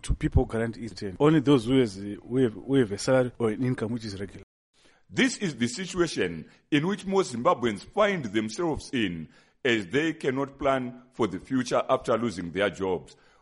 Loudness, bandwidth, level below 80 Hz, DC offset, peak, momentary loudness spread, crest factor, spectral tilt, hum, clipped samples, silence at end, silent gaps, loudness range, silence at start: -27 LUFS; 11.5 kHz; -42 dBFS; under 0.1%; -10 dBFS; 9 LU; 18 dB; -5.5 dB/octave; none; under 0.1%; 0.3 s; 4.43-4.73 s; 4 LU; 0.05 s